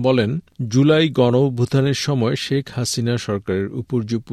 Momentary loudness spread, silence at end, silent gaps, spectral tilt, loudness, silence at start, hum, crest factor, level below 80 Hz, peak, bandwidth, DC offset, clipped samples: 8 LU; 0 s; none; -6 dB/octave; -19 LUFS; 0 s; none; 16 dB; -54 dBFS; -4 dBFS; 13.5 kHz; under 0.1%; under 0.1%